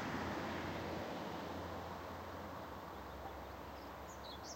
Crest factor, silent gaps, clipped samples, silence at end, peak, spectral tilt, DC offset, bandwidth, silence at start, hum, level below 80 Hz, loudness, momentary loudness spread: 16 dB; none; under 0.1%; 0 s; -30 dBFS; -5 dB/octave; under 0.1%; 16 kHz; 0 s; none; -60 dBFS; -46 LUFS; 8 LU